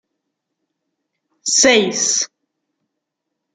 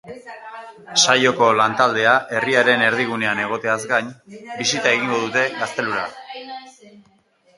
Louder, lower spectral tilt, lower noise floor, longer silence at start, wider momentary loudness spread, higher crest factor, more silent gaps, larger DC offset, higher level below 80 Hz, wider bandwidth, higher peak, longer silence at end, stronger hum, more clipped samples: first, -14 LUFS vs -18 LUFS; second, -1 dB/octave vs -2.5 dB/octave; first, -78 dBFS vs -58 dBFS; first, 1.45 s vs 0.05 s; second, 14 LU vs 21 LU; about the same, 20 dB vs 20 dB; neither; neither; about the same, -62 dBFS vs -66 dBFS; about the same, 11 kHz vs 11.5 kHz; about the same, 0 dBFS vs 0 dBFS; first, 1.3 s vs 0.85 s; neither; neither